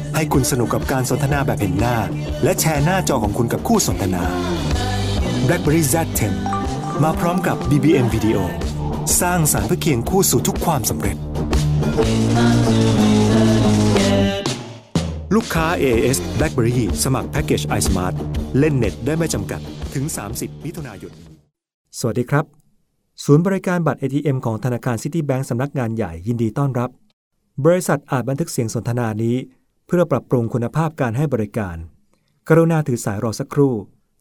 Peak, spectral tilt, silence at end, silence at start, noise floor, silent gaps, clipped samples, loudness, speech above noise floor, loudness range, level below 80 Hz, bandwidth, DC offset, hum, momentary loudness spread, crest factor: 0 dBFS; -5.5 dB/octave; 0.35 s; 0 s; -62 dBFS; 21.74-21.85 s, 27.13-27.31 s; under 0.1%; -19 LUFS; 44 dB; 6 LU; -32 dBFS; 16 kHz; under 0.1%; none; 9 LU; 18 dB